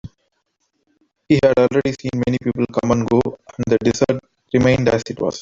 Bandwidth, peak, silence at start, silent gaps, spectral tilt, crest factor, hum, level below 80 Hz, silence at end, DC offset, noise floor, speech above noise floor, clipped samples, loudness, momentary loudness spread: 7.8 kHz; -2 dBFS; 0.05 s; none; -6.5 dB/octave; 16 dB; none; -46 dBFS; 0 s; under 0.1%; -70 dBFS; 53 dB; under 0.1%; -18 LUFS; 8 LU